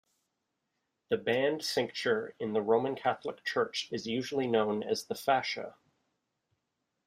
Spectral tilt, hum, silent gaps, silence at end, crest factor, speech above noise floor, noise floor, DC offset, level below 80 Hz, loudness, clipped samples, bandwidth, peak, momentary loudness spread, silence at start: -4 dB/octave; none; none; 1.35 s; 20 dB; 52 dB; -83 dBFS; under 0.1%; -76 dBFS; -32 LUFS; under 0.1%; 15.5 kHz; -14 dBFS; 7 LU; 1.1 s